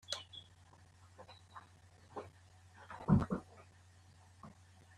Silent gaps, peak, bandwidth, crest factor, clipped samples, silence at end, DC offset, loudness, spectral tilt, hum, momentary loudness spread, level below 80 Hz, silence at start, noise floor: none; -18 dBFS; 12 kHz; 26 dB; under 0.1%; 0.5 s; under 0.1%; -39 LUFS; -6.5 dB/octave; none; 30 LU; -60 dBFS; 0.1 s; -63 dBFS